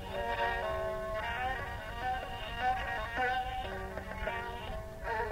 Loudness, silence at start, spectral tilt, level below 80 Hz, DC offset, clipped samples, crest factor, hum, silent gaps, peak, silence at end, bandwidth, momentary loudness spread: -36 LUFS; 0 s; -5 dB/octave; -46 dBFS; under 0.1%; under 0.1%; 16 dB; none; none; -20 dBFS; 0 s; 16 kHz; 8 LU